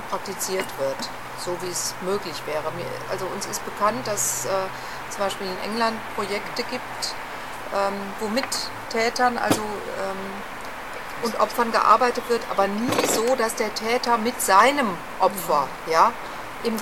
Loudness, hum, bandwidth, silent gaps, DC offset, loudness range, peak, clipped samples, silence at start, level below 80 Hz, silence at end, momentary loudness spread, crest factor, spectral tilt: -24 LUFS; none; 17 kHz; none; 0.9%; 6 LU; -4 dBFS; under 0.1%; 0 s; -50 dBFS; 0 s; 12 LU; 20 dB; -2.5 dB/octave